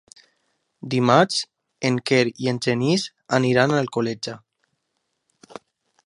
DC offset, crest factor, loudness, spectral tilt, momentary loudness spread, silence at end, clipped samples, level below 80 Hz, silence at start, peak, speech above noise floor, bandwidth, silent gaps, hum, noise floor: under 0.1%; 22 dB; -21 LUFS; -5 dB/octave; 14 LU; 1.7 s; under 0.1%; -64 dBFS; 0.85 s; 0 dBFS; 55 dB; 11.5 kHz; none; none; -75 dBFS